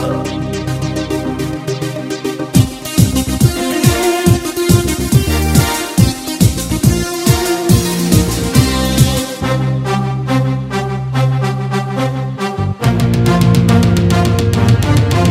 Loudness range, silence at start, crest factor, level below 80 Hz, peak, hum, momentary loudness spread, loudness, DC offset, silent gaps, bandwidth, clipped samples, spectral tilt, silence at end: 4 LU; 0 s; 12 dB; -26 dBFS; 0 dBFS; none; 8 LU; -14 LUFS; under 0.1%; none; 16.5 kHz; under 0.1%; -5.5 dB/octave; 0 s